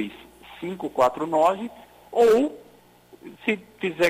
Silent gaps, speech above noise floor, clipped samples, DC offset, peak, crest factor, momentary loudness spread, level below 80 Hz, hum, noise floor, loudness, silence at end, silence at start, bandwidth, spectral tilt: none; 31 dB; under 0.1%; under 0.1%; -8 dBFS; 16 dB; 16 LU; -60 dBFS; 60 Hz at -60 dBFS; -53 dBFS; -23 LUFS; 0 s; 0 s; 16 kHz; -5 dB/octave